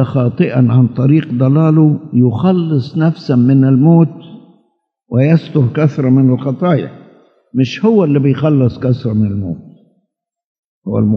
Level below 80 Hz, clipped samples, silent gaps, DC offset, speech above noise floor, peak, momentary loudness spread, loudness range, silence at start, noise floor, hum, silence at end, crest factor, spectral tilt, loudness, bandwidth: -54 dBFS; under 0.1%; 10.44-10.82 s; under 0.1%; 56 dB; 0 dBFS; 8 LU; 3 LU; 0 s; -68 dBFS; none; 0 s; 12 dB; -10 dB/octave; -12 LUFS; 6.2 kHz